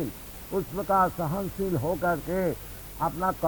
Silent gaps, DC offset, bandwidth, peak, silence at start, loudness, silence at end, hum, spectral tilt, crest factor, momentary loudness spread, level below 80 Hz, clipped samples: none; under 0.1%; over 20 kHz; -12 dBFS; 0 s; -28 LUFS; 0 s; none; -6.5 dB/octave; 16 dB; 11 LU; -46 dBFS; under 0.1%